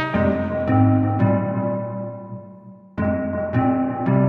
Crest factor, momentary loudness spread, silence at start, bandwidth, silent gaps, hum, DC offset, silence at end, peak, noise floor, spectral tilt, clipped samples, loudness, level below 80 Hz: 16 dB; 16 LU; 0 s; 4.3 kHz; none; none; under 0.1%; 0 s; -4 dBFS; -42 dBFS; -11 dB/octave; under 0.1%; -21 LUFS; -46 dBFS